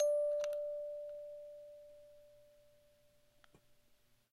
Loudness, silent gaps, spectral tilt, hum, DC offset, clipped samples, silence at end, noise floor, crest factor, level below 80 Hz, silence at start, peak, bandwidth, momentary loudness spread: -40 LUFS; none; -1.5 dB/octave; 60 Hz at -85 dBFS; under 0.1%; under 0.1%; 1.9 s; -71 dBFS; 18 dB; -80 dBFS; 0 s; -24 dBFS; 12.5 kHz; 25 LU